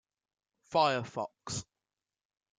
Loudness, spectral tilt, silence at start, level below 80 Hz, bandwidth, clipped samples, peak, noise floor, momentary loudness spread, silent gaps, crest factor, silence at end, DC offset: -33 LUFS; -3.5 dB/octave; 0.7 s; -72 dBFS; 9.6 kHz; under 0.1%; -14 dBFS; under -90 dBFS; 12 LU; none; 22 dB; 0.95 s; under 0.1%